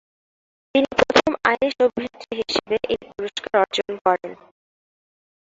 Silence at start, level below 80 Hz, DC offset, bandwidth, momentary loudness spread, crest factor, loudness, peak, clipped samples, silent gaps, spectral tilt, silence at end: 0.75 s; -54 dBFS; under 0.1%; 7.8 kHz; 12 LU; 22 dB; -21 LUFS; -2 dBFS; under 0.1%; 4.01-4.05 s; -3.5 dB/octave; 1.1 s